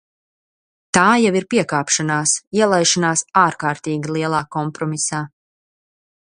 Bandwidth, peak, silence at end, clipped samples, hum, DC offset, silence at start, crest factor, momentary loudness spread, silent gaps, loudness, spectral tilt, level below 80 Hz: 10.5 kHz; 0 dBFS; 1.1 s; under 0.1%; none; under 0.1%; 0.95 s; 20 dB; 9 LU; 2.47-2.51 s; -17 LUFS; -3.5 dB/octave; -58 dBFS